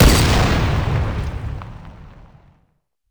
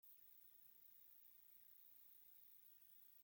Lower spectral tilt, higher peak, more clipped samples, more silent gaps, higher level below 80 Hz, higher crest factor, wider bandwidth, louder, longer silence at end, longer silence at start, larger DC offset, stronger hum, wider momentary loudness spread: first, -5 dB/octave vs -0.5 dB/octave; first, -2 dBFS vs -56 dBFS; neither; neither; first, -22 dBFS vs under -90 dBFS; about the same, 16 dB vs 12 dB; first, over 20 kHz vs 17 kHz; first, -18 LUFS vs -64 LUFS; first, 1 s vs 0 s; about the same, 0 s vs 0 s; neither; neither; first, 23 LU vs 1 LU